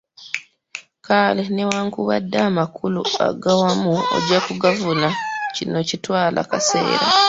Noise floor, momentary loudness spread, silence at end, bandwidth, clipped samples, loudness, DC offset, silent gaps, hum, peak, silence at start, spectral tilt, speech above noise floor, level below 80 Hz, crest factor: -39 dBFS; 12 LU; 0 s; 8 kHz; under 0.1%; -19 LUFS; under 0.1%; none; none; 0 dBFS; 0.2 s; -4 dB/octave; 20 dB; -58 dBFS; 18 dB